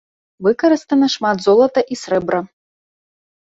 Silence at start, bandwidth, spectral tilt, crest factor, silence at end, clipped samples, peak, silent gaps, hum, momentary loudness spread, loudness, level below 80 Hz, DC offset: 0.4 s; 8 kHz; -5 dB/octave; 14 dB; 0.95 s; under 0.1%; -2 dBFS; none; none; 7 LU; -16 LUFS; -60 dBFS; under 0.1%